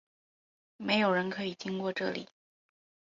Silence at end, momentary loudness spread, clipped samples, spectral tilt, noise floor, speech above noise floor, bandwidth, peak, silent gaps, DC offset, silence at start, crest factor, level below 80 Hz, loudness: 0.8 s; 11 LU; under 0.1%; -5.5 dB/octave; under -90 dBFS; over 58 dB; 7.6 kHz; -14 dBFS; none; under 0.1%; 0.8 s; 20 dB; -74 dBFS; -32 LUFS